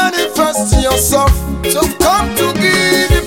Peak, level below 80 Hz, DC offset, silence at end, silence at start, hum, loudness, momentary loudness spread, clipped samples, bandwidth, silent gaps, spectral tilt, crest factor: 0 dBFS; -20 dBFS; under 0.1%; 0 s; 0 s; none; -12 LUFS; 4 LU; under 0.1%; 17.5 kHz; none; -3.5 dB/octave; 12 dB